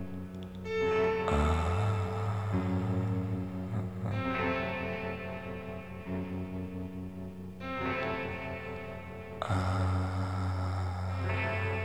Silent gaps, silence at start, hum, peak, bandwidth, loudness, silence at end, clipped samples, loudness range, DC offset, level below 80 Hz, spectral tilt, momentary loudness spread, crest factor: none; 0 s; none; -16 dBFS; 11 kHz; -34 LUFS; 0 s; under 0.1%; 6 LU; 0.2%; -46 dBFS; -7.5 dB/octave; 12 LU; 16 dB